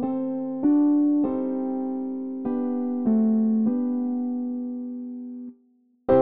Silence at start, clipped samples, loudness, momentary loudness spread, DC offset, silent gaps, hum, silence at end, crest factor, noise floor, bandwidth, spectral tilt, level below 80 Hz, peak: 0 s; under 0.1%; -25 LUFS; 14 LU; 0.2%; none; none; 0 s; 16 dB; -62 dBFS; 3.3 kHz; -10 dB/octave; -60 dBFS; -8 dBFS